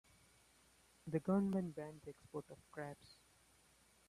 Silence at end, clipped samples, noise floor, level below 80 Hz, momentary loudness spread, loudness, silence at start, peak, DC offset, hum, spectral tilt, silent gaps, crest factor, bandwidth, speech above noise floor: 0.95 s; under 0.1%; -72 dBFS; -76 dBFS; 20 LU; -43 LUFS; 1.05 s; -26 dBFS; under 0.1%; none; -8 dB/octave; none; 20 dB; 13 kHz; 29 dB